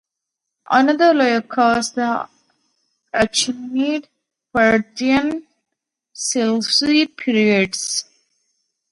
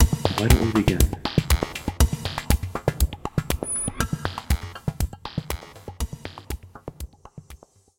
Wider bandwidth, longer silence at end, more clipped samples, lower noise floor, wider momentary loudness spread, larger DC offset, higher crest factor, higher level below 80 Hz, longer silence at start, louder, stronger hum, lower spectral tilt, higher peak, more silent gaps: second, 11.5 kHz vs 17 kHz; first, 0.9 s vs 0.45 s; neither; first, -81 dBFS vs -48 dBFS; second, 11 LU vs 19 LU; neither; about the same, 18 dB vs 22 dB; second, -56 dBFS vs -28 dBFS; first, 0.7 s vs 0 s; first, -18 LUFS vs -25 LUFS; neither; second, -3 dB/octave vs -5 dB/octave; about the same, 0 dBFS vs -2 dBFS; neither